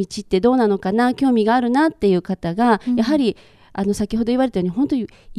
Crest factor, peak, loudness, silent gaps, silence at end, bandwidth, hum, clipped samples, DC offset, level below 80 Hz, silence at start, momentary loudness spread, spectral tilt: 16 dB; -2 dBFS; -18 LUFS; none; 0 s; 12.5 kHz; none; under 0.1%; under 0.1%; -46 dBFS; 0 s; 7 LU; -6.5 dB/octave